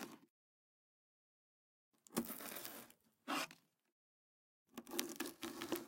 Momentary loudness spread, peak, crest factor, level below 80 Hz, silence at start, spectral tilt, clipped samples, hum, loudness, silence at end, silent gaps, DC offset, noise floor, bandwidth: 15 LU; -14 dBFS; 36 dB; -86 dBFS; 0 s; -2.5 dB/octave; under 0.1%; none; -46 LUFS; 0 s; 0.30-1.92 s, 3.92-4.65 s; under 0.1%; under -90 dBFS; 17 kHz